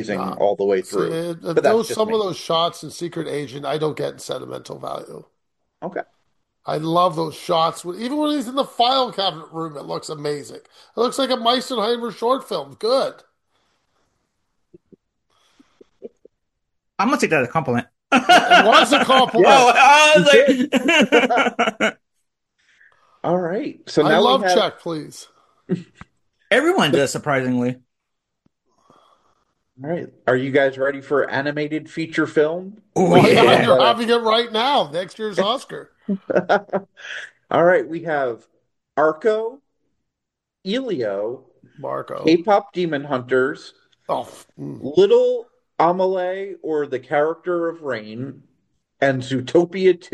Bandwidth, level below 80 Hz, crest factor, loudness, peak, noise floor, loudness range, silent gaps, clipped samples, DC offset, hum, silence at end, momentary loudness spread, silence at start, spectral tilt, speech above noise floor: 12.5 kHz; -64 dBFS; 20 dB; -18 LUFS; 0 dBFS; -82 dBFS; 12 LU; none; under 0.1%; under 0.1%; none; 0.1 s; 18 LU; 0 s; -4.5 dB/octave; 64 dB